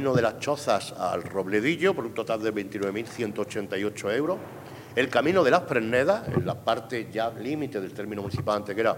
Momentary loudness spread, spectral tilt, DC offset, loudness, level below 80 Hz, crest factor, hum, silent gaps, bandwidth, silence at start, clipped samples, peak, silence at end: 9 LU; -5.5 dB/octave; under 0.1%; -27 LUFS; -62 dBFS; 20 dB; none; none; 16.5 kHz; 0 s; under 0.1%; -6 dBFS; 0 s